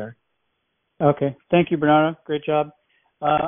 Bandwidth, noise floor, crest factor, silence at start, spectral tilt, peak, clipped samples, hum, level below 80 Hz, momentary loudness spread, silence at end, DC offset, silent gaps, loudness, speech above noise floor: 3.7 kHz; -74 dBFS; 18 dB; 0 s; -5.5 dB/octave; -4 dBFS; under 0.1%; none; -56 dBFS; 10 LU; 0 s; under 0.1%; none; -21 LUFS; 54 dB